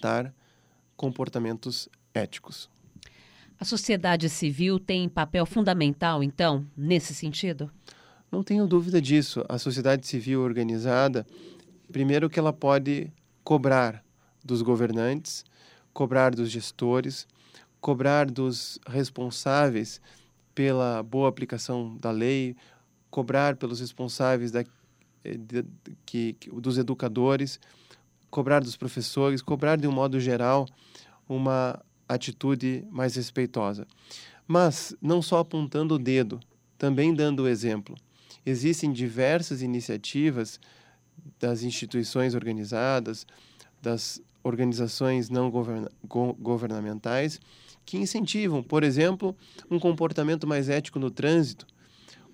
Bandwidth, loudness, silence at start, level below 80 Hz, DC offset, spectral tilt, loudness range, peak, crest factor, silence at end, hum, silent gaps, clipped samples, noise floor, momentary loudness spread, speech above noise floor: 16 kHz; -27 LUFS; 0 s; -62 dBFS; under 0.1%; -6 dB/octave; 4 LU; -6 dBFS; 20 dB; 0.7 s; none; none; under 0.1%; -64 dBFS; 12 LU; 37 dB